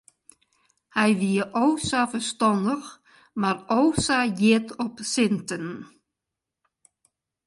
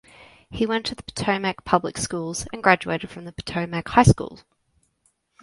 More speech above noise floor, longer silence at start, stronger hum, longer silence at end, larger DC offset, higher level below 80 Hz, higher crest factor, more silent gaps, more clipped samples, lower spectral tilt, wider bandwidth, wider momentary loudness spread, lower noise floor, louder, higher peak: first, 63 dB vs 45 dB; first, 0.95 s vs 0.2 s; neither; first, 1.6 s vs 1.05 s; neither; second, -56 dBFS vs -42 dBFS; second, 18 dB vs 24 dB; neither; neither; about the same, -4.5 dB/octave vs -5 dB/octave; about the same, 11.5 kHz vs 11.5 kHz; about the same, 11 LU vs 13 LU; first, -86 dBFS vs -68 dBFS; about the same, -24 LUFS vs -23 LUFS; second, -8 dBFS vs 0 dBFS